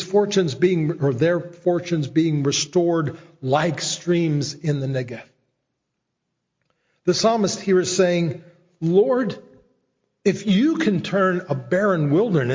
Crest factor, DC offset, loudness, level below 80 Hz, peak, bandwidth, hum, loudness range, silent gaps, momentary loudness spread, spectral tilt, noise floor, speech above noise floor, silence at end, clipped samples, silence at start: 16 dB; under 0.1%; -21 LUFS; -62 dBFS; -6 dBFS; 7.6 kHz; none; 4 LU; none; 8 LU; -5.5 dB/octave; -78 dBFS; 58 dB; 0 s; under 0.1%; 0 s